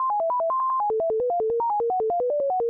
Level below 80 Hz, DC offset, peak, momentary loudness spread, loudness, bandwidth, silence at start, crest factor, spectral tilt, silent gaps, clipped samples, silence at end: -64 dBFS; under 0.1%; -20 dBFS; 1 LU; -24 LUFS; 2.3 kHz; 0 s; 4 dB; -10 dB/octave; none; under 0.1%; 0 s